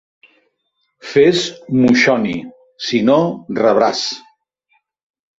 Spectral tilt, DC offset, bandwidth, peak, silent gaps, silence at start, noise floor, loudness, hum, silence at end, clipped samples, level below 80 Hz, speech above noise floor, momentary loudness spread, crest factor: -5 dB/octave; under 0.1%; 8 kHz; -2 dBFS; none; 1.05 s; -69 dBFS; -15 LUFS; none; 1.2 s; under 0.1%; -56 dBFS; 55 dB; 13 LU; 16 dB